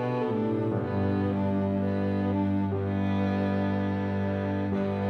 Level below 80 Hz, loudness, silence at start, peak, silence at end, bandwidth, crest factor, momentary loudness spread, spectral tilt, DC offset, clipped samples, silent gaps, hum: -64 dBFS; -28 LUFS; 0 s; -16 dBFS; 0 s; 6 kHz; 12 dB; 2 LU; -10 dB/octave; under 0.1%; under 0.1%; none; 50 Hz at -55 dBFS